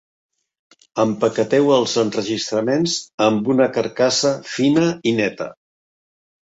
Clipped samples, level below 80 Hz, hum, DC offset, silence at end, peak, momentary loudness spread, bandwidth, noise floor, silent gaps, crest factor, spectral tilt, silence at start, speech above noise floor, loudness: under 0.1%; -62 dBFS; none; under 0.1%; 1 s; -4 dBFS; 6 LU; 8 kHz; under -90 dBFS; 3.14-3.18 s; 16 dB; -4.5 dB/octave; 0.95 s; over 72 dB; -18 LUFS